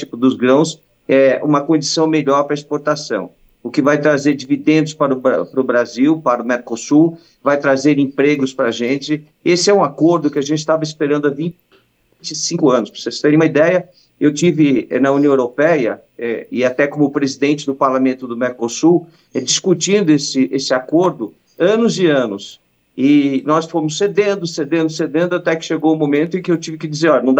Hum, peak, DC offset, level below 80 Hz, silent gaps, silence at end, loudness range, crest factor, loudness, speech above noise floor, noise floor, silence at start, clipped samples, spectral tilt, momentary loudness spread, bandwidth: none; -2 dBFS; under 0.1%; -66 dBFS; none; 0 s; 2 LU; 14 dB; -15 LUFS; 40 dB; -55 dBFS; 0 s; under 0.1%; -5 dB/octave; 8 LU; 8.6 kHz